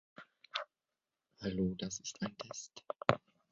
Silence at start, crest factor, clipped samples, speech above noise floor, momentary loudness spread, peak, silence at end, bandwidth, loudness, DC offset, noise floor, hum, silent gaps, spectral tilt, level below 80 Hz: 0.2 s; 34 dB; under 0.1%; over 50 dB; 14 LU; -8 dBFS; 0.35 s; 7.8 kHz; -40 LUFS; under 0.1%; under -90 dBFS; none; none; -4.5 dB/octave; -64 dBFS